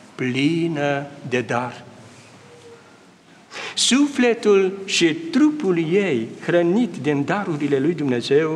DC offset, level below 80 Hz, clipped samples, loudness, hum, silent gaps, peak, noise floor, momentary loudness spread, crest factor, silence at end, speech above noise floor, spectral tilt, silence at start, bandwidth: under 0.1%; -70 dBFS; under 0.1%; -20 LUFS; none; none; -6 dBFS; -49 dBFS; 8 LU; 14 dB; 0 s; 30 dB; -4.5 dB/octave; 0.05 s; 12 kHz